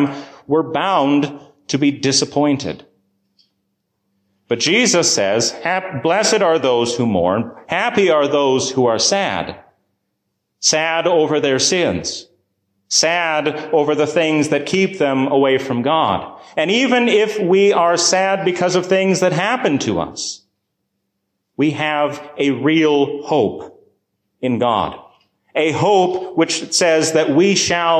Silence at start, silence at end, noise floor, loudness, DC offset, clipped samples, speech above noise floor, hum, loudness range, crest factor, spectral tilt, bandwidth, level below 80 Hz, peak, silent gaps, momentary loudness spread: 0 s; 0 s; -73 dBFS; -16 LUFS; under 0.1%; under 0.1%; 57 dB; none; 4 LU; 14 dB; -3.5 dB/octave; 14 kHz; -54 dBFS; -2 dBFS; none; 9 LU